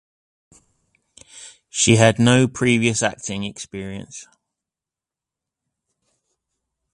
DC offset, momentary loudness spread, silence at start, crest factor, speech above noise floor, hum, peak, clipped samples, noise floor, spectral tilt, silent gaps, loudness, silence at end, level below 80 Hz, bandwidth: under 0.1%; 25 LU; 1.35 s; 22 dB; 70 dB; none; 0 dBFS; under 0.1%; -89 dBFS; -4.5 dB/octave; none; -18 LUFS; 2.7 s; -52 dBFS; 11 kHz